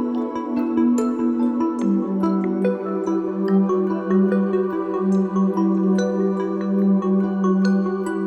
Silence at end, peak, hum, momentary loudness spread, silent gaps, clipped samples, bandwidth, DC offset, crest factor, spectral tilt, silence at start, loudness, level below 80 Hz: 0 s; -8 dBFS; none; 4 LU; none; under 0.1%; 8.4 kHz; under 0.1%; 12 dB; -8.5 dB/octave; 0 s; -20 LUFS; -62 dBFS